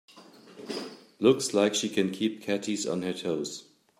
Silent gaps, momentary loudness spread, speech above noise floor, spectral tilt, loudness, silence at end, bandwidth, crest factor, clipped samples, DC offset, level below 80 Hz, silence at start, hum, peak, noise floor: none; 14 LU; 25 dB; -4 dB/octave; -28 LUFS; 0.4 s; 15.5 kHz; 22 dB; under 0.1%; under 0.1%; -76 dBFS; 0.15 s; none; -8 dBFS; -52 dBFS